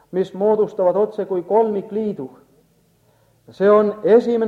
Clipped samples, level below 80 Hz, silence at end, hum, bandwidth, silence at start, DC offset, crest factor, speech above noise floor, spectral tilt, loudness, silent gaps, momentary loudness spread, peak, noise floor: under 0.1%; -66 dBFS; 0 s; none; 7 kHz; 0.15 s; under 0.1%; 16 dB; 41 dB; -8.5 dB/octave; -18 LUFS; none; 10 LU; -2 dBFS; -58 dBFS